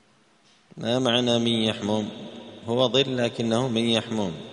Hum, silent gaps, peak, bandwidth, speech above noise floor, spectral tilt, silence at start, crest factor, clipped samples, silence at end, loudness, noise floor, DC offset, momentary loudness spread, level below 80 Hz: none; none; -6 dBFS; 10.5 kHz; 36 dB; -5 dB/octave; 0.75 s; 18 dB; under 0.1%; 0 s; -24 LUFS; -60 dBFS; under 0.1%; 12 LU; -62 dBFS